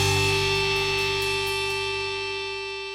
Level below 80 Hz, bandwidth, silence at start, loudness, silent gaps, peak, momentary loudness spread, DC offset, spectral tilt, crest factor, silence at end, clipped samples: -46 dBFS; 16.5 kHz; 0 s; -24 LUFS; none; -10 dBFS; 8 LU; under 0.1%; -3 dB/octave; 14 dB; 0 s; under 0.1%